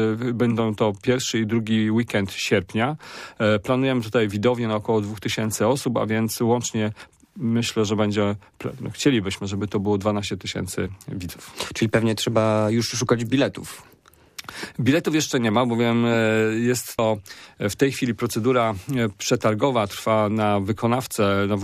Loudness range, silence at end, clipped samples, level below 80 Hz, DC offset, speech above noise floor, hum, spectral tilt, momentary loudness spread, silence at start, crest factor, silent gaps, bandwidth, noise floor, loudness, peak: 3 LU; 0 s; under 0.1%; -56 dBFS; under 0.1%; 22 dB; none; -5 dB/octave; 10 LU; 0 s; 16 dB; none; 15.5 kHz; -44 dBFS; -22 LUFS; -6 dBFS